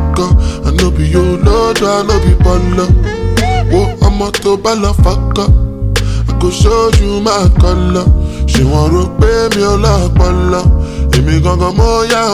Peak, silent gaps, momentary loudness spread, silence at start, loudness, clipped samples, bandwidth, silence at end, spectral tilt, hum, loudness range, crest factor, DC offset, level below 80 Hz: 0 dBFS; none; 4 LU; 0 s; -11 LUFS; under 0.1%; 14.5 kHz; 0 s; -6 dB/octave; none; 1 LU; 10 dB; under 0.1%; -14 dBFS